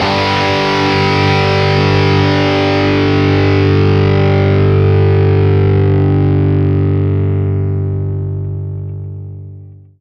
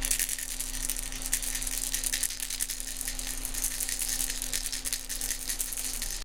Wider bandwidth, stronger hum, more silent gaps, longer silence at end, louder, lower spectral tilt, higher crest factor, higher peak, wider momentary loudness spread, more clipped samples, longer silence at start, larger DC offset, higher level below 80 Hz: second, 6.8 kHz vs 17 kHz; neither; neither; first, 0.25 s vs 0 s; first, -12 LUFS vs -30 LUFS; first, -7.5 dB/octave vs 0 dB/octave; second, 12 dB vs 24 dB; first, 0 dBFS vs -8 dBFS; first, 11 LU vs 4 LU; neither; about the same, 0 s vs 0 s; second, under 0.1% vs 0.5%; about the same, -38 dBFS vs -40 dBFS